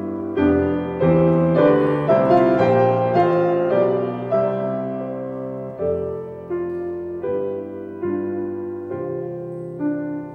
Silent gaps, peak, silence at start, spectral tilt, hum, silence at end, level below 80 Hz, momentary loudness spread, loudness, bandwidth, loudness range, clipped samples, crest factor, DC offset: none; -4 dBFS; 0 s; -10 dB/octave; none; 0 s; -50 dBFS; 13 LU; -20 LUFS; 5.6 kHz; 10 LU; under 0.1%; 16 dB; under 0.1%